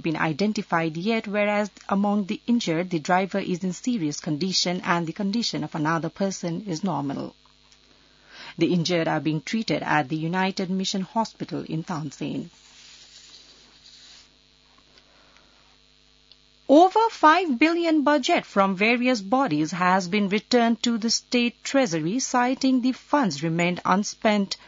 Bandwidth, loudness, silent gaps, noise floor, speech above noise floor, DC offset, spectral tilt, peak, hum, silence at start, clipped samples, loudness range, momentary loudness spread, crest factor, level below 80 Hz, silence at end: 7.8 kHz; -23 LUFS; none; -58 dBFS; 35 dB; under 0.1%; -4.5 dB/octave; -6 dBFS; none; 0.05 s; under 0.1%; 9 LU; 10 LU; 18 dB; -66 dBFS; 0.1 s